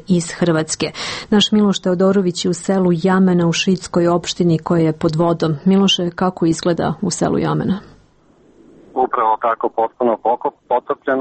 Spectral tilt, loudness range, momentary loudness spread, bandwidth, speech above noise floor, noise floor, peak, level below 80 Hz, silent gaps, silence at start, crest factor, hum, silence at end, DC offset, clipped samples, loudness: -5.5 dB/octave; 4 LU; 6 LU; 8.8 kHz; 35 dB; -52 dBFS; -4 dBFS; -50 dBFS; none; 0.1 s; 14 dB; none; 0 s; under 0.1%; under 0.1%; -17 LUFS